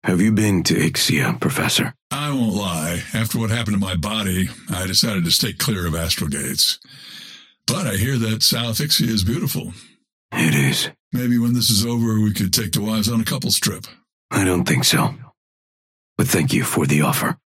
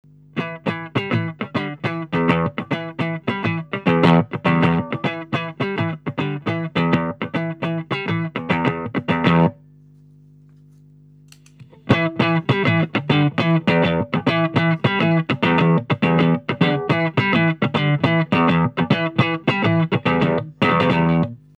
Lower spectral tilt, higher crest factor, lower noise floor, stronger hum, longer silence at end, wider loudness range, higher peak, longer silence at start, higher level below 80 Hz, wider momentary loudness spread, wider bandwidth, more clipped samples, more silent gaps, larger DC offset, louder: second, -4 dB/octave vs -8 dB/octave; about the same, 18 dB vs 18 dB; first, under -90 dBFS vs -48 dBFS; second, none vs 50 Hz at -45 dBFS; about the same, 0.2 s vs 0.25 s; second, 2 LU vs 5 LU; about the same, -2 dBFS vs -2 dBFS; second, 0.05 s vs 0.35 s; first, -46 dBFS vs -52 dBFS; about the same, 8 LU vs 8 LU; first, 16.5 kHz vs 6.8 kHz; neither; first, 2.02-2.10 s, 10.12-10.29 s, 11.00-11.11 s, 14.12-14.29 s, 15.37-16.16 s vs none; neither; about the same, -19 LUFS vs -19 LUFS